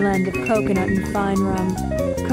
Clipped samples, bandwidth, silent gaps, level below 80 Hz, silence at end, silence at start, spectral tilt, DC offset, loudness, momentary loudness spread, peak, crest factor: under 0.1%; 16 kHz; none; -36 dBFS; 0 s; 0 s; -6.5 dB/octave; under 0.1%; -21 LUFS; 4 LU; -8 dBFS; 12 dB